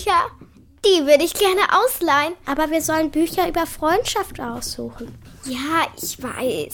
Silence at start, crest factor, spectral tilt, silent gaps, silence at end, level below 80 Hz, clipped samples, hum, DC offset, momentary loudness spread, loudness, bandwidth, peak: 0 s; 20 dB; -3 dB/octave; none; 0 s; -44 dBFS; under 0.1%; none; under 0.1%; 13 LU; -20 LUFS; 19 kHz; 0 dBFS